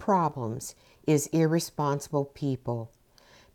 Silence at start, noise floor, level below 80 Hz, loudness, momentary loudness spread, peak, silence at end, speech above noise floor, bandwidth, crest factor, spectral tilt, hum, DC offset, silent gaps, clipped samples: 0 s; -58 dBFS; -62 dBFS; -29 LUFS; 11 LU; -12 dBFS; 0.7 s; 30 dB; 18.5 kHz; 16 dB; -6 dB/octave; none; under 0.1%; none; under 0.1%